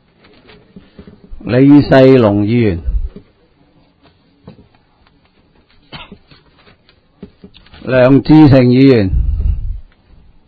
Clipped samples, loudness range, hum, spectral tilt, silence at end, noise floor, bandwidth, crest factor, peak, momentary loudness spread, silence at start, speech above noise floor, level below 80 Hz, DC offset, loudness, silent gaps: 0.6%; 11 LU; none; -10 dB/octave; 0.65 s; -51 dBFS; 5 kHz; 12 dB; 0 dBFS; 24 LU; 1.3 s; 44 dB; -26 dBFS; under 0.1%; -9 LUFS; none